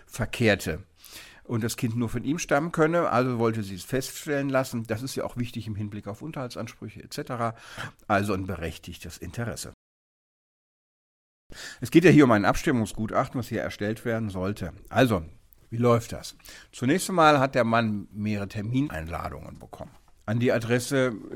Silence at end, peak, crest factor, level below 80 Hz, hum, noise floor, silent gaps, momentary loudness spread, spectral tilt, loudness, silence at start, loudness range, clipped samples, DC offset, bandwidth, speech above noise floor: 0 s; -4 dBFS; 22 dB; -50 dBFS; none; -47 dBFS; 9.74-11.50 s; 19 LU; -6 dB/octave; -26 LUFS; 0.1 s; 9 LU; under 0.1%; under 0.1%; 17 kHz; 22 dB